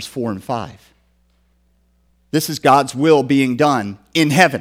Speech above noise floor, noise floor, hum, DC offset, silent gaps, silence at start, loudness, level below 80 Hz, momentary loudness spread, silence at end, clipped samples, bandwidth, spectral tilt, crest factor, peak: 43 dB; -59 dBFS; none; under 0.1%; none; 0 s; -16 LUFS; -56 dBFS; 12 LU; 0 s; under 0.1%; 16.5 kHz; -5 dB/octave; 18 dB; 0 dBFS